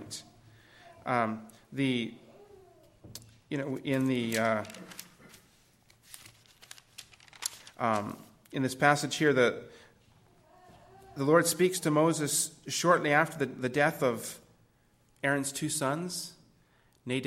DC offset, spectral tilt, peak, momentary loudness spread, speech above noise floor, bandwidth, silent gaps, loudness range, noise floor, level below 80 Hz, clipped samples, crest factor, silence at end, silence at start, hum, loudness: under 0.1%; -4 dB/octave; -8 dBFS; 23 LU; 38 dB; 16.5 kHz; none; 10 LU; -67 dBFS; -70 dBFS; under 0.1%; 24 dB; 0 s; 0 s; none; -29 LUFS